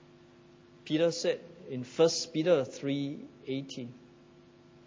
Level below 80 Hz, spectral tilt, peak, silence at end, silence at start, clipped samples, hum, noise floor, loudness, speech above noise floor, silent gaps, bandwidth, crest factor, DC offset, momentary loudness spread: -76 dBFS; -4.5 dB/octave; -14 dBFS; 0.9 s; 0.85 s; under 0.1%; none; -57 dBFS; -31 LUFS; 27 dB; none; 7.8 kHz; 20 dB; under 0.1%; 16 LU